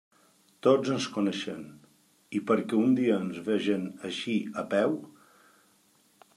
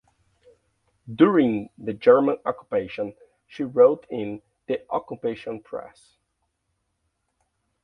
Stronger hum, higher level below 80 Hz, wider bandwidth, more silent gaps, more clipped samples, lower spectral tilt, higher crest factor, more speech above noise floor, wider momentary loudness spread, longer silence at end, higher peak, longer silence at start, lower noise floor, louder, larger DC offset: neither; second, -78 dBFS vs -64 dBFS; first, 13 kHz vs 5.4 kHz; neither; neither; second, -6 dB/octave vs -8.5 dB/octave; about the same, 22 dB vs 22 dB; second, 37 dB vs 53 dB; second, 11 LU vs 17 LU; second, 1.25 s vs 1.95 s; second, -8 dBFS vs -2 dBFS; second, 0.65 s vs 1.05 s; second, -65 dBFS vs -75 dBFS; second, -29 LUFS vs -23 LUFS; neither